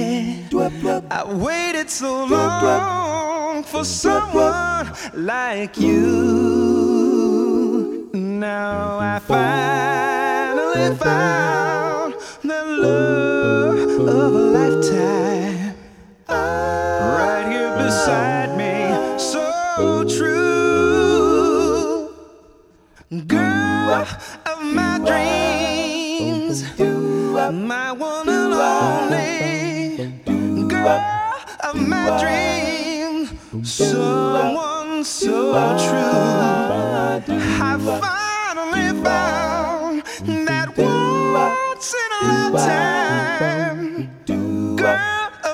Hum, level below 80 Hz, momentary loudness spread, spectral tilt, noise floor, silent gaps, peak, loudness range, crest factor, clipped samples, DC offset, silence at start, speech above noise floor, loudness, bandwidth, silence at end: none; -46 dBFS; 8 LU; -5 dB/octave; -50 dBFS; none; -4 dBFS; 3 LU; 16 dB; under 0.1%; under 0.1%; 0 s; 32 dB; -19 LUFS; 16 kHz; 0 s